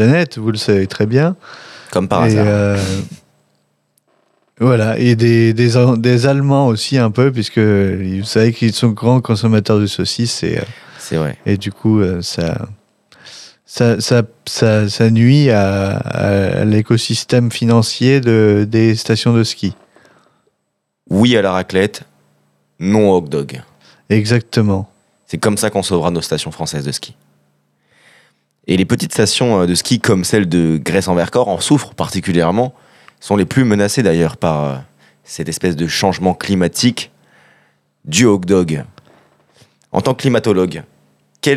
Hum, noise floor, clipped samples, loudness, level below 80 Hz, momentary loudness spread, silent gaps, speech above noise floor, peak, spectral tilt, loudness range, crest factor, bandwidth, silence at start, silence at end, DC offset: none; -71 dBFS; under 0.1%; -14 LUFS; -48 dBFS; 11 LU; none; 57 dB; 0 dBFS; -5.5 dB/octave; 5 LU; 14 dB; 14 kHz; 0 s; 0 s; under 0.1%